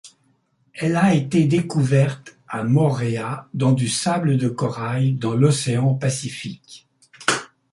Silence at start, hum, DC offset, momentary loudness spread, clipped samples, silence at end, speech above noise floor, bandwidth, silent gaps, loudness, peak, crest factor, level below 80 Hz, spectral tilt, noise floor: 0.05 s; none; under 0.1%; 11 LU; under 0.1%; 0.25 s; 44 dB; 11.5 kHz; none; -20 LUFS; -2 dBFS; 18 dB; -58 dBFS; -6 dB/octave; -64 dBFS